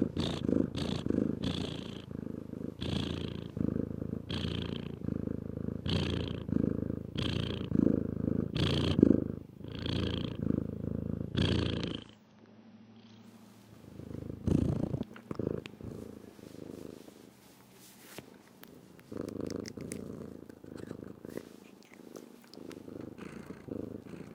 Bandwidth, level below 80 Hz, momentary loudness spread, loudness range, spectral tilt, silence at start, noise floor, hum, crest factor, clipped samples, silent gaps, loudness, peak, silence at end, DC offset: 16.5 kHz; -54 dBFS; 23 LU; 15 LU; -7 dB/octave; 0 s; -58 dBFS; none; 30 dB; under 0.1%; none; -35 LUFS; -6 dBFS; 0 s; under 0.1%